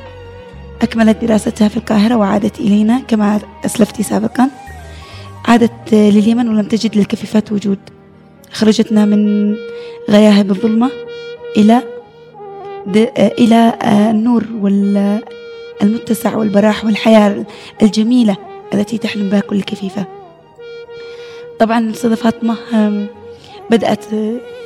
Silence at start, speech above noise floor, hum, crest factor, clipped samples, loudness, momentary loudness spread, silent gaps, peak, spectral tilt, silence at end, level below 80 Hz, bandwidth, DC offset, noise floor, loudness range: 0 s; 29 dB; none; 14 dB; under 0.1%; -13 LUFS; 21 LU; none; 0 dBFS; -6.5 dB/octave; 0 s; -46 dBFS; 13 kHz; under 0.1%; -41 dBFS; 4 LU